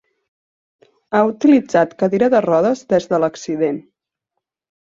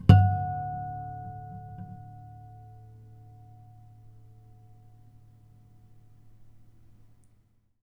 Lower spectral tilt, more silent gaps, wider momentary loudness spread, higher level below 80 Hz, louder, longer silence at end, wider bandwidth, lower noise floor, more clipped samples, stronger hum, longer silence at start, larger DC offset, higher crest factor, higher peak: second, -6.5 dB/octave vs -9 dB/octave; neither; second, 7 LU vs 27 LU; second, -60 dBFS vs -46 dBFS; first, -16 LUFS vs -28 LUFS; second, 1.1 s vs 5.65 s; first, 7.6 kHz vs 5.2 kHz; first, -79 dBFS vs -64 dBFS; neither; neither; first, 1.1 s vs 0.05 s; neither; second, 16 dB vs 30 dB; about the same, -2 dBFS vs -2 dBFS